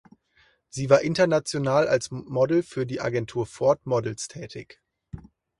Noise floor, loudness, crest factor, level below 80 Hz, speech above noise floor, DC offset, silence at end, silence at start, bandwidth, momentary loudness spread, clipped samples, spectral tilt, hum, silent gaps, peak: -63 dBFS; -24 LUFS; 22 dB; -58 dBFS; 39 dB; under 0.1%; 0.4 s; 0.75 s; 11.5 kHz; 19 LU; under 0.1%; -5.5 dB/octave; none; none; -2 dBFS